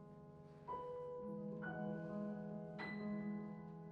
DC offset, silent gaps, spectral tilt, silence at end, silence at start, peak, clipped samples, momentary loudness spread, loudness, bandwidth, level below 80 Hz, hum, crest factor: under 0.1%; none; -9 dB/octave; 0 s; 0 s; -34 dBFS; under 0.1%; 10 LU; -48 LUFS; 5 kHz; -76 dBFS; none; 12 dB